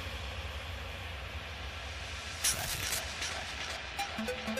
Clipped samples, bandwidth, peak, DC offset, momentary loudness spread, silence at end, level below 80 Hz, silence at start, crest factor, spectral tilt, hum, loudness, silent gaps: under 0.1%; 15.5 kHz; -16 dBFS; under 0.1%; 10 LU; 0 s; -48 dBFS; 0 s; 22 dB; -2 dB/octave; none; -36 LUFS; none